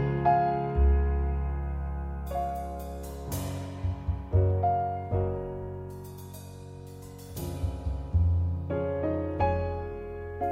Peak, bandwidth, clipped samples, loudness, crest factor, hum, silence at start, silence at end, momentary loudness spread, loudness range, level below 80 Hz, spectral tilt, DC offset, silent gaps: -12 dBFS; 16 kHz; under 0.1%; -30 LUFS; 18 dB; none; 0 s; 0 s; 17 LU; 4 LU; -34 dBFS; -8 dB/octave; under 0.1%; none